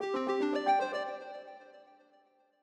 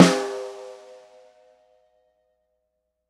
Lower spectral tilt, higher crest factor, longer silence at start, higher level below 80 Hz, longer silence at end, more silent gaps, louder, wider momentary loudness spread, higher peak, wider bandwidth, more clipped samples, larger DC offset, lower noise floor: about the same, -4 dB/octave vs -5 dB/octave; second, 16 dB vs 26 dB; about the same, 0 s vs 0 s; second, -88 dBFS vs -70 dBFS; second, 0.8 s vs 2.35 s; neither; second, -32 LUFS vs -23 LUFS; second, 20 LU vs 27 LU; second, -18 dBFS vs 0 dBFS; second, 9.6 kHz vs 14 kHz; neither; neither; second, -68 dBFS vs -77 dBFS